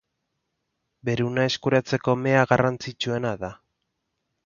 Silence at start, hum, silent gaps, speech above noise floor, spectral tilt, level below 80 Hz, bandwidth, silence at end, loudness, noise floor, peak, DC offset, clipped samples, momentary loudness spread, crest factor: 1.05 s; none; none; 55 dB; -6 dB/octave; -58 dBFS; 7.4 kHz; 0.9 s; -24 LUFS; -78 dBFS; -2 dBFS; under 0.1%; under 0.1%; 11 LU; 22 dB